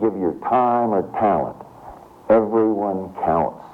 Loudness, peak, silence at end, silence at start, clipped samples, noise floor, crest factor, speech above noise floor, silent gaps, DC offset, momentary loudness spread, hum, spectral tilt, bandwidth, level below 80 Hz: -20 LUFS; -6 dBFS; 0 s; 0 s; under 0.1%; -41 dBFS; 14 dB; 22 dB; none; under 0.1%; 12 LU; none; -9.5 dB/octave; 4.8 kHz; -50 dBFS